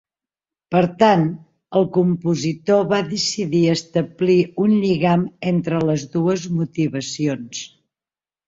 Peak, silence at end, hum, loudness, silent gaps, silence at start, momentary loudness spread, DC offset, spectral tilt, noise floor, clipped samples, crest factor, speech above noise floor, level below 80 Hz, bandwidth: -2 dBFS; 0.8 s; none; -19 LUFS; none; 0.7 s; 7 LU; under 0.1%; -6 dB/octave; under -90 dBFS; under 0.1%; 18 dB; over 72 dB; -58 dBFS; 7.8 kHz